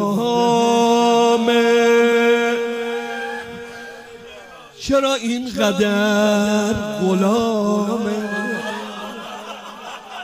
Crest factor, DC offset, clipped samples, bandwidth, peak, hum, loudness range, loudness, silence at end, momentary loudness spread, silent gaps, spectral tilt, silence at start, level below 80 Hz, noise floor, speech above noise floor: 16 dB; under 0.1%; under 0.1%; 16 kHz; -2 dBFS; none; 6 LU; -17 LUFS; 0 s; 19 LU; none; -4.5 dB/octave; 0 s; -52 dBFS; -40 dBFS; 22 dB